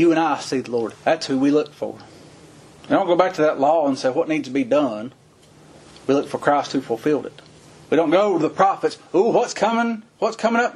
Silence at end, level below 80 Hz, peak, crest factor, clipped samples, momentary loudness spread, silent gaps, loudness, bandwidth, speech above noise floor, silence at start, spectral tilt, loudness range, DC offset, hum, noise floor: 0 s; -64 dBFS; -2 dBFS; 18 dB; under 0.1%; 8 LU; none; -20 LUFS; 11.5 kHz; 30 dB; 0 s; -5 dB/octave; 3 LU; under 0.1%; none; -50 dBFS